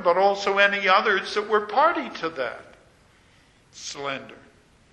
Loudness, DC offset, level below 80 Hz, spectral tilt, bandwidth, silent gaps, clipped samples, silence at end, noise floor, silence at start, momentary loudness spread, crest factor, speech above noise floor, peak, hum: -22 LUFS; under 0.1%; -64 dBFS; -3 dB/octave; 10 kHz; none; under 0.1%; 0.6 s; -57 dBFS; 0 s; 16 LU; 22 dB; 34 dB; -2 dBFS; none